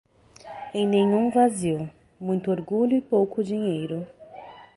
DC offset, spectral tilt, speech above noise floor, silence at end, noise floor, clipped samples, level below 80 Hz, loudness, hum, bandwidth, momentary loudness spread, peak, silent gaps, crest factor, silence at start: under 0.1%; -6.5 dB/octave; 22 dB; 0.1 s; -45 dBFS; under 0.1%; -62 dBFS; -24 LUFS; none; 11.5 kHz; 20 LU; -8 dBFS; none; 16 dB; 0.45 s